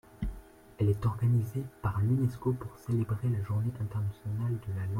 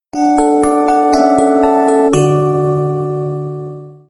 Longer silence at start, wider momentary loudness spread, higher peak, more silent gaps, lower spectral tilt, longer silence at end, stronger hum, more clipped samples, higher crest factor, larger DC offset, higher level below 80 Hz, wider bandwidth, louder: about the same, 0.15 s vs 0.15 s; about the same, 9 LU vs 11 LU; second, -16 dBFS vs 0 dBFS; neither; first, -9.5 dB/octave vs -7 dB/octave; second, 0 s vs 0.15 s; neither; neither; about the same, 14 dB vs 12 dB; neither; second, -50 dBFS vs -42 dBFS; first, 15.5 kHz vs 11.5 kHz; second, -32 LUFS vs -12 LUFS